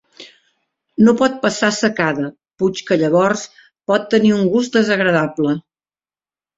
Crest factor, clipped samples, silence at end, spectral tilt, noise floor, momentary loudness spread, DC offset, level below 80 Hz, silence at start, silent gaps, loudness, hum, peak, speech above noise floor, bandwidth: 16 dB; under 0.1%; 1 s; -5 dB/octave; under -90 dBFS; 10 LU; under 0.1%; -58 dBFS; 0.2 s; none; -16 LUFS; none; 0 dBFS; over 75 dB; 7.8 kHz